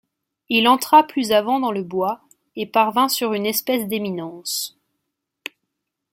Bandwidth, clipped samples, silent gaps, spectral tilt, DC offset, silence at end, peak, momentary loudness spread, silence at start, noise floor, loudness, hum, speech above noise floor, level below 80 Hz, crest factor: 16.5 kHz; under 0.1%; none; -3.5 dB/octave; under 0.1%; 1.45 s; -2 dBFS; 19 LU; 0.5 s; -79 dBFS; -19 LUFS; none; 60 dB; -68 dBFS; 20 dB